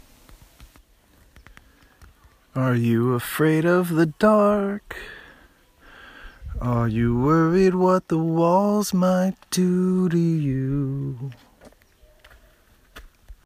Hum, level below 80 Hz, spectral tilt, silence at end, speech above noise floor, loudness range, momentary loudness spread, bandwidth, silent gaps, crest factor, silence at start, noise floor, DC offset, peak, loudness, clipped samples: none; -46 dBFS; -7 dB/octave; 0.15 s; 36 dB; 6 LU; 15 LU; 15.5 kHz; none; 18 dB; 0.6 s; -56 dBFS; under 0.1%; -6 dBFS; -21 LUFS; under 0.1%